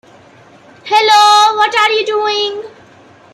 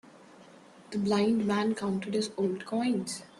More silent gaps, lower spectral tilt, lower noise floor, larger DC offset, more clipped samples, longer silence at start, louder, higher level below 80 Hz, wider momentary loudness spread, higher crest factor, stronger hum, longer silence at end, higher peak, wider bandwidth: neither; second, 0 dB/octave vs -5.5 dB/octave; second, -42 dBFS vs -54 dBFS; neither; neither; first, 0.85 s vs 0.05 s; first, -10 LUFS vs -30 LUFS; about the same, -68 dBFS vs -70 dBFS; first, 13 LU vs 6 LU; about the same, 12 dB vs 14 dB; neither; first, 0.65 s vs 0.15 s; first, 0 dBFS vs -16 dBFS; first, 16 kHz vs 12.5 kHz